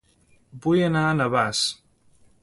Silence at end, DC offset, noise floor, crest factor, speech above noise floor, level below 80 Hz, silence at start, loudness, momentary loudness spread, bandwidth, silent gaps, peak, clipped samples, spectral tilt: 0.7 s; under 0.1%; -60 dBFS; 18 dB; 38 dB; -58 dBFS; 0.55 s; -22 LUFS; 8 LU; 11.5 kHz; none; -8 dBFS; under 0.1%; -5 dB/octave